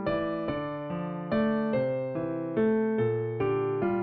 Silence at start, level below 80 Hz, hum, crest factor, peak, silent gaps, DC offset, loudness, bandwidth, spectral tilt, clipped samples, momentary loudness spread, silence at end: 0 s; -56 dBFS; none; 14 dB; -16 dBFS; none; under 0.1%; -29 LUFS; 4.6 kHz; -7 dB/octave; under 0.1%; 7 LU; 0 s